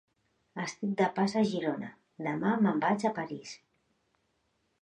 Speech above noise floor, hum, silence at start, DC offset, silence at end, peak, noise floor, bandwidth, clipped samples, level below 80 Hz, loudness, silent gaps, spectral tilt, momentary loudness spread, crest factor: 46 dB; none; 0.55 s; under 0.1%; 1.25 s; -14 dBFS; -76 dBFS; 9.6 kHz; under 0.1%; -76 dBFS; -31 LUFS; none; -6 dB/octave; 17 LU; 18 dB